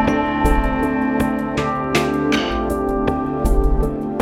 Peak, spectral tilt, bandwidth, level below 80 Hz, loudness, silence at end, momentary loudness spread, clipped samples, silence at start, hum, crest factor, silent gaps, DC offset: -4 dBFS; -6 dB/octave; 15.5 kHz; -24 dBFS; -19 LUFS; 0 s; 3 LU; under 0.1%; 0 s; none; 14 dB; none; under 0.1%